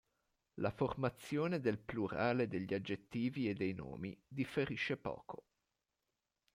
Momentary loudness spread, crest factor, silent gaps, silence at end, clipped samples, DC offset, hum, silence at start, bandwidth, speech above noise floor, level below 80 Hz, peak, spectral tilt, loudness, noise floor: 10 LU; 18 dB; none; 1.2 s; under 0.1%; under 0.1%; none; 0.55 s; 16 kHz; 50 dB; -68 dBFS; -22 dBFS; -7 dB/octave; -40 LUFS; -89 dBFS